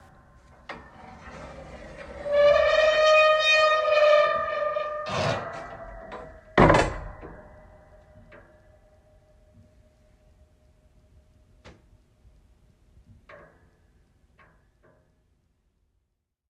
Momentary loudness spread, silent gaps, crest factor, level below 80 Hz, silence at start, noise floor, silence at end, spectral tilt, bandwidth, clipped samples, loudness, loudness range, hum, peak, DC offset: 25 LU; none; 22 dB; -46 dBFS; 0.7 s; -79 dBFS; 4.8 s; -5 dB/octave; 9.8 kHz; under 0.1%; -21 LUFS; 7 LU; none; -4 dBFS; under 0.1%